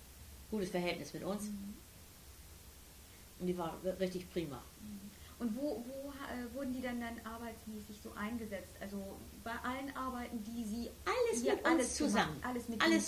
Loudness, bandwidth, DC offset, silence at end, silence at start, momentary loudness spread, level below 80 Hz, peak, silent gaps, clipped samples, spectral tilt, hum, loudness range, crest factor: -39 LUFS; 16 kHz; under 0.1%; 0 s; 0 s; 21 LU; -60 dBFS; -16 dBFS; none; under 0.1%; -4 dB/octave; none; 8 LU; 22 dB